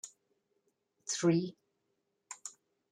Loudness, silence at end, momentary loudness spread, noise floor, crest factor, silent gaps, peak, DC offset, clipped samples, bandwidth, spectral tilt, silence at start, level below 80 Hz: -33 LUFS; 0.4 s; 20 LU; -82 dBFS; 22 dB; none; -18 dBFS; under 0.1%; under 0.1%; 11.5 kHz; -5 dB/octave; 0.05 s; -80 dBFS